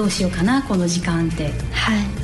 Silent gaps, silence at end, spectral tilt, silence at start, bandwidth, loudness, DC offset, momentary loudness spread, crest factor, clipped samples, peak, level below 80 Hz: none; 0 s; -5 dB/octave; 0 s; 12 kHz; -20 LUFS; under 0.1%; 4 LU; 12 dB; under 0.1%; -8 dBFS; -32 dBFS